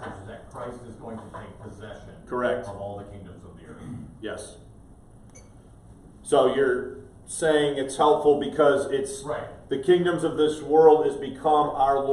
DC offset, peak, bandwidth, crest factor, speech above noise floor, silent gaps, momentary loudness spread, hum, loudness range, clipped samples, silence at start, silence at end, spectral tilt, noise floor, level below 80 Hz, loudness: under 0.1%; -4 dBFS; 12 kHz; 20 dB; 25 dB; none; 22 LU; none; 13 LU; under 0.1%; 0 s; 0 s; -5 dB/octave; -49 dBFS; -52 dBFS; -23 LUFS